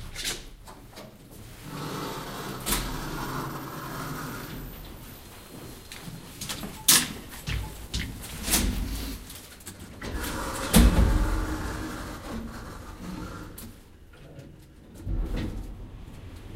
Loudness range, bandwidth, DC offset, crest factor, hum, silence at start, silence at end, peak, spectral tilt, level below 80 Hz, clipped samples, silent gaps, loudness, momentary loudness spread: 12 LU; 16 kHz; under 0.1%; 28 dB; none; 0 s; 0 s; -2 dBFS; -3.5 dB/octave; -34 dBFS; under 0.1%; none; -29 LUFS; 22 LU